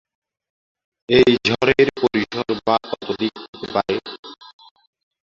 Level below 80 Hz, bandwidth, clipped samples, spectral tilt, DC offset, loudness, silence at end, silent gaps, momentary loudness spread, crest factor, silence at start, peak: -52 dBFS; 7.4 kHz; under 0.1%; -5.5 dB/octave; under 0.1%; -19 LUFS; 0.9 s; 3.48-3.53 s, 4.19-4.23 s; 16 LU; 20 dB; 1.1 s; -2 dBFS